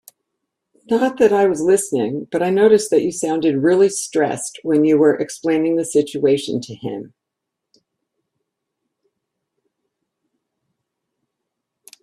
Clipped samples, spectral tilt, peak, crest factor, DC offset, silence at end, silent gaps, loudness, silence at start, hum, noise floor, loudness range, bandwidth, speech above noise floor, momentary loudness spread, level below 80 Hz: under 0.1%; -5 dB/octave; -2 dBFS; 18 dB; under 0.1%; 4.95 s; none; -17 LUFS; 0.9 s; none; -81 dBFS; 10 LU; 13 kHz; 64 dB; 10 LU; -64 dBFS